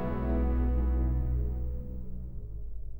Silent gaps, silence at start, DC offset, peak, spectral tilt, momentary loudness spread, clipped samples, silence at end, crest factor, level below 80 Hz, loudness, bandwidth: none; 0 s; under 0.1%; -18 dBFS; -11.5 dB/octave; 14 LU; under 0.1%; 0 s; 12 dB; -32 dBFS; -32 LUFS; 2.9 kHz